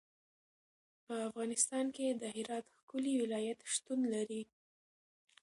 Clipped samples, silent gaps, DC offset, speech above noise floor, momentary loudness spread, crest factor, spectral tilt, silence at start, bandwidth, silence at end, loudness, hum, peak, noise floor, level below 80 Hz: under 0.1%; 2.83-2.88 s; under 0.1%; over 52 dB; 11 LU; 22 dB; -3 dB/octave; 1.1 s; 11.5 kHz; 1 s; -38 LUFS; none; -20 dBFS; under -90 dBFS; -88 dBFS